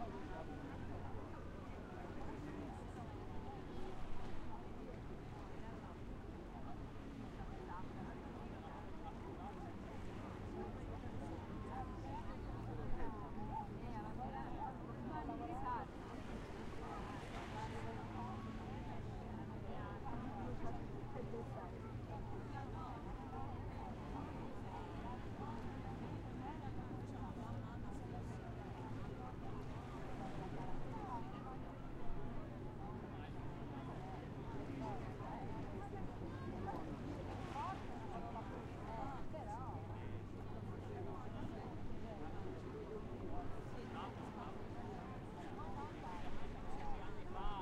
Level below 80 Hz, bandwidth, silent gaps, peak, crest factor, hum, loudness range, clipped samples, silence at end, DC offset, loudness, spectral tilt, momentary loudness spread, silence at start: -54 dBFS; 10.5 kHz; none; -30 dBFS; 18 dB; none; 3 LU; under 0.1%; 0 s; under 0.1%; -49 LUFS; -7.5 dB/octave; 4 LU; 0 s